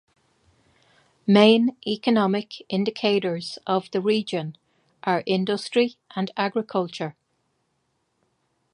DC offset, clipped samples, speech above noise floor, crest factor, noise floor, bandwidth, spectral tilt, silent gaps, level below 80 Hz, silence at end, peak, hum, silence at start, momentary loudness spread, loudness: under 0.1%; under 0.1%; 50 dB; 22 dB; -72 dBFS; 10.5 kHz; -6 dB/octave; none; -74 dBFS; 1.65 s; -2 dBFS; none; 1.25 s; 14 LU; -23 LUFS